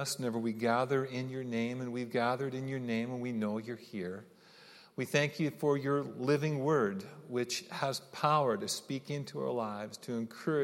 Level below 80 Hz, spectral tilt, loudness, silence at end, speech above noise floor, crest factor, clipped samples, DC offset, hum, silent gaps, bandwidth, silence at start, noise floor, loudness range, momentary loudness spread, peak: -82 dBFS; -5 dB/octave; -34 LUFS; 0 s; 24 dB; 20 dB; under 0.1%; under 0.1%; none; none; 16.5 kHz; 0 s; -58 dBFS; 4 LU; 10 LU; -14 dBFS